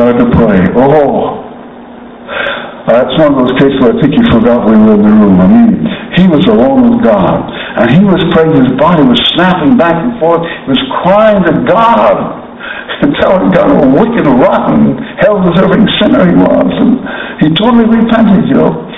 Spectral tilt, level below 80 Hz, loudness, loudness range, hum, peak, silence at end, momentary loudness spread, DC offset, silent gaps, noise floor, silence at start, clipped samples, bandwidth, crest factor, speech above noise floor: -9 dB/octave; -32 dBFS; -7 LUFS; 3 LU; none; 0 dBFS; 0 s; 8 LU; under 0.1%; none; -28 dBFS; 0 s; 3%; 4.4 kHz; 6 dB; 22 dB